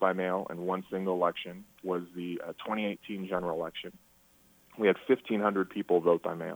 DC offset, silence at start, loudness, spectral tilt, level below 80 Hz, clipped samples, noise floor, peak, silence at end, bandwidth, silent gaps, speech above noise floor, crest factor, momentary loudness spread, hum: under 0.1%; 0 s; -31 LUFS; -7 dB/octave; -70 dBFS; under 0.1%; -63 dBFS; -12 dBFS; 0 s; over 20 kHz; none; 32 dB; 20 dB; 12 LU; none